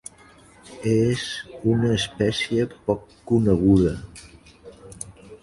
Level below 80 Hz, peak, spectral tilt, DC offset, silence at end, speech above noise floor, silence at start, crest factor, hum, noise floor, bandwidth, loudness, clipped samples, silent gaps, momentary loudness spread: -42 dBFS; -6 dBFS; -6 dB/octave; under 0.1%; 0.05 s; 29 dB; 0.65 s; 18 dB; none; -51 dBFS; 11.5 kHz; -22 LUFS; under 0.1%; none; 20 LU